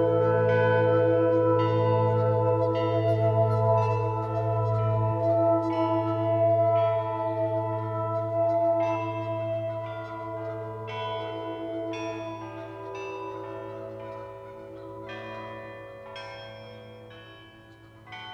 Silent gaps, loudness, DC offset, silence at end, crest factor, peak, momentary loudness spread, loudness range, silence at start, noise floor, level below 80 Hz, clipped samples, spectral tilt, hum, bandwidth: none; -26 LUFS; under 0.1%; 0 s; 16 dB; -12 dBFS; 19 LU; 16 LU; 0 s; -51 dBFS; -60 dBFS; under 0.1%; -8.5 dB/octave; none; 6.4 kHz